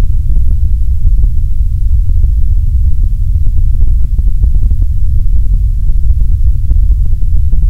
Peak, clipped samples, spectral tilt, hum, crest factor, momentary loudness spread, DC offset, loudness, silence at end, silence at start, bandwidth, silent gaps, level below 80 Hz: 0 dBFS; 2%; -9.5 dB/octave; none; 6 dB; 2 LU; under 0.1%; -14 LUFS; 0 s; 0 s; 0.7 kHz; none; -8 dBFS